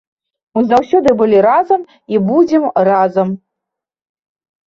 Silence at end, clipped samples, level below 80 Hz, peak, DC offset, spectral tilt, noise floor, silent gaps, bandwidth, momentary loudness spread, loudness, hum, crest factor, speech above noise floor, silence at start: 1.3 s; under 0.1%; -52 dBFS; 0 dBFS; under 0.1%; -8 dB/octave; -81 dBFS; none; 7.6 kHz; 8 LU; -13 LUFS; none; 12 dB; 69 dB; 0.55 s